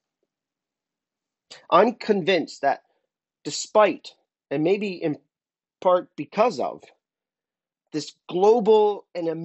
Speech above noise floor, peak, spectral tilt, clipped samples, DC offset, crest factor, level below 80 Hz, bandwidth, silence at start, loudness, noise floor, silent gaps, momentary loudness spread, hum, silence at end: over 68 dB; -4 dBFS; -5 dB/octave; under 0.1%; under 0.1%; 20 dB; -76 dBFS; 8.2 kHz; 1.5 s; -23 LUFS; under -90 dBFS; none; 14 LU; none; 0 s